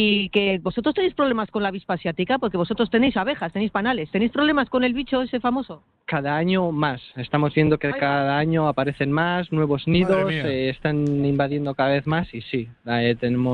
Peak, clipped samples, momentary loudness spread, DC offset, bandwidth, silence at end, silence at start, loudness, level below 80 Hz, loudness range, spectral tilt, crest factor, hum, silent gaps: -6 dBFS; under 0.1%; 6 LU; under 0.1%; 4.9 kHz; 0 s; 0 s; -22 LUFS; -50 dBFS; 2 LU; -8.5 dB/octave; 16 dB; none; none